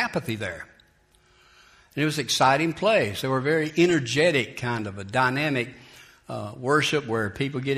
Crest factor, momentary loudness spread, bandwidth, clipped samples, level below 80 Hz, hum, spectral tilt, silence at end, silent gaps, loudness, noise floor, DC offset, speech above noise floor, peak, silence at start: 20 dB; 13 LU; 15.5 kHz; under 0.1%; -60 dBFS; none; -4.5 dB/octave; 0 s; none; -24 LUFS; -61 dBFS; under 0.1%; 37 dB; -6 dBFS; 0 s